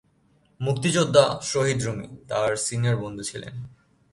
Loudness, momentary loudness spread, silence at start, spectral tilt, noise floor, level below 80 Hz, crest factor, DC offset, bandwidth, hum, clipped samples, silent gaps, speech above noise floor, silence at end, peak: -24 LUFS; 17 LU; 0.6 s; -4.5 dB/octave; -63 dBFS; -56 dBFS; 22 dB; under 0.1%; 11.5 kHz; none; under 0.1%; none; 39 dB; 0.45 s; -2 dBFS